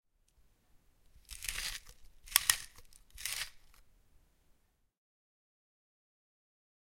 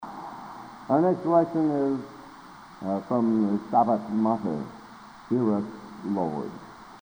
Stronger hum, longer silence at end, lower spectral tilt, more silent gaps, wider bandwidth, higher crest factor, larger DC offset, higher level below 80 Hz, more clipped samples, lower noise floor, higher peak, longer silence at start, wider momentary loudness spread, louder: neither; first, 2.9 s vs 0 s; second, 2 dB/octave vs -9 dB/octave; neither; second, 16.5 kHz vs over 20 kHz; first, 38 dB vs 20 dB; neither; first, -60 dBFS vs -66 dBFS; neither; first, -71 dBFS vs -47 dBFS; first, -4 dBFS vs -8 dBFS; first, 1.15 s vs 0 s; second, 19 LU vs 22 LU; second, -35 LUFS vs -26 LUFS